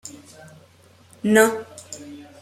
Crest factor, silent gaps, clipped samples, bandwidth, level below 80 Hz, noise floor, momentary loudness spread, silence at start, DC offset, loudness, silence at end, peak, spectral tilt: 22 dB; none; under 0.1%; 15 kHz; -66 dBFS; -53 dBFS; 24 LU; 0.05 s; under 0.1%; -19 LUFS; 0.2 s; -2 dBFS; -4 dB/octave